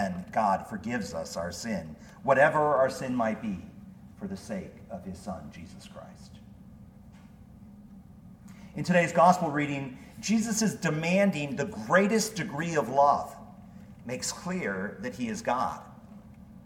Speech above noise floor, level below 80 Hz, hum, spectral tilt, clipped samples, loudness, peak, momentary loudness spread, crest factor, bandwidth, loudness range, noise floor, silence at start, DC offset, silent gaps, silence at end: 23 dB; -58 dBFS; none; -5 dB/octave; under 0.1%; -28 LUFS; -8 dBFS; 23 LU; 22 dB; 17 kHz; 17 LU; -51 dBFS; 0 s; under 0.1%; none; 0 s